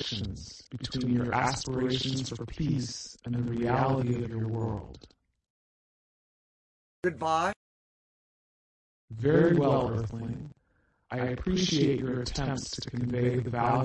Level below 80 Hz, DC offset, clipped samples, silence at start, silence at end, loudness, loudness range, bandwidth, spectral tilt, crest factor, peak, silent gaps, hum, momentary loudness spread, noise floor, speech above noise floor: -50 dBFS; under 0.1%; under 0.1%; 0 s; 0 s; -30 LUFS; 7 LU; 10 kHz; -6 dB/octave; 20 dB; -12 dBFS; 5.50-7.03 s, 7.56-9.08 s; none; 13 LU; -71 dBFS; 42 dB